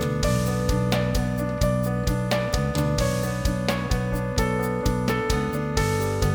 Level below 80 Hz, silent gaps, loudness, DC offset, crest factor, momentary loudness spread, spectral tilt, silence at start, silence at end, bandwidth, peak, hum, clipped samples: -32 dBFS; none; -24 LUFS; under 0.1%; 16 dB; 2 LU; -5.5 dB/octave; 0 s; 0 s; over 20 kHz; -6 dBFS; none; under 0.1%